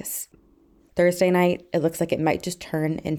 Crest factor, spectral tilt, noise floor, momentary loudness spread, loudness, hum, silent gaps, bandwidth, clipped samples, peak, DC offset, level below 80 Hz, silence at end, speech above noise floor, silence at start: 16 dB; -5.5 dB/octave; -57 dBFS; 12 LU; -23 LUFS; none; none; 19 kHz; under 0.1%; -8 dBFS; under 0.1%; -56 dBFS; 0 s; 34 dB; 0 s